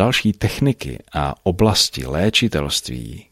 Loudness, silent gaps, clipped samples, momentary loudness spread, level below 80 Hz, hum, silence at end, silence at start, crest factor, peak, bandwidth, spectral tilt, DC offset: -19 LUFS; none; under 0.1%; 11 LU; -36 dBFS; none; 0.1 s; 0 s; 18 dB; -2 dBFS; 15.5 kHz; -4.5 dB/octave; under 0.1%